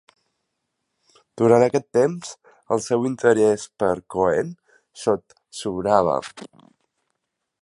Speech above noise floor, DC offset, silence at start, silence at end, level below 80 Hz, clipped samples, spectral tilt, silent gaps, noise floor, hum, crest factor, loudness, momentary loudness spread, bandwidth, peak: 57 dB; under 0.1%; 1.35 s; 1.15 s; -58 dBFS; under 0.1%; -5.5 dB/octave; none; -78 dBFS; none; 20 dB; -21 LUFS; 15 LU; 11.5 kHz; -2 dBFS